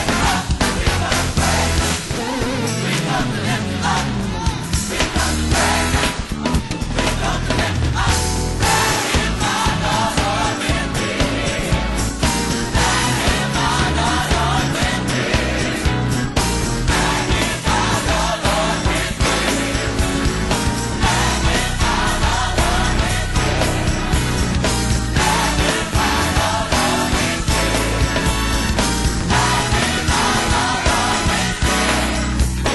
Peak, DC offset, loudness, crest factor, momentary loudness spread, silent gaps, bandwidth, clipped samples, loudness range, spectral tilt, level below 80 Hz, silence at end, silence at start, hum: -4 dBFS; under 0.1%; -18 LUFS; 14 dB; 4 LU; none; 12 kHz; under 0.1%; 2 LU; -4 dB/octave; -24 dBFS; 0 s; 0 s; none